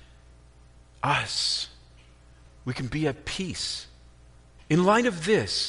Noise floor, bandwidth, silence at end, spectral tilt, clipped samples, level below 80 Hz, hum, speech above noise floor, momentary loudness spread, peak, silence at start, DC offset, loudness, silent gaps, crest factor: -53 dBFS; 10.5 kHz; 0 s; -4 dB/octave; under 0.1%; -52 dBFS; 60 Hz at -55 dBFS; 28 dB; 14 LU; -8 dBFS; 1.05 s; under 0.1%; -26 LUFS; none; 20 dB